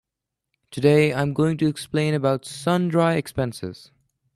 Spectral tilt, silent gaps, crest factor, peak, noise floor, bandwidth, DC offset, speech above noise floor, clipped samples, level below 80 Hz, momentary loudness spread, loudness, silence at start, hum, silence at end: -6.5 dB/octave; none; 18 dB; -4 dBFS; -84 dBFS; 13.5 kHz; under 0.1%; 63 dB; under 0.1%; -56 dBFS; 10 LU; -22 LUFS; 0.7 s; none; 0.6 s